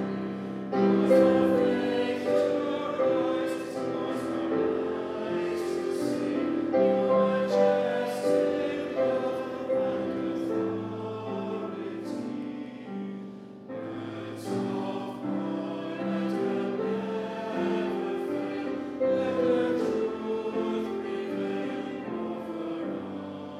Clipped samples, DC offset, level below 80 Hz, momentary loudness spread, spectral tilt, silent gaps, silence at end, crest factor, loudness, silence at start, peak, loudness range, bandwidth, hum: under 0.1%; under 0.1%; -72 dBFS; 11 LU; -7 dB/octave; none; 0 s; 18 dB; -29 LUFS; 0 s; -10 dBFS; 9 LU; 13.5 kHz; none